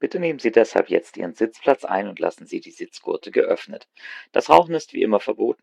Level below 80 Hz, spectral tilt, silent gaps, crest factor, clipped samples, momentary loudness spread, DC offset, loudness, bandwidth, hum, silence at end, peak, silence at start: -64 dBFS; -5.5 dB/octave; none; 22 dB; under 0.1%; 18 LU; under 0.1%; -21 LUFS; 11 kHz; none; 0.1 s; 0 dBFS; 0 s